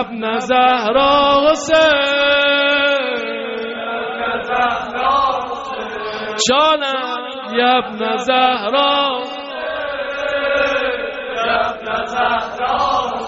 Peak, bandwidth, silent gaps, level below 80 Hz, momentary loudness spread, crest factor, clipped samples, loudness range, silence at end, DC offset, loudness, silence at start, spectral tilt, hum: -2 dBFS; 8 kHz; none; -48 dBFS; 11 LU; 14 dB; under 0.1%; 6 LU; 0 s; under 0.1%; -16 LUFS; 0 s; 0 dB/octave; none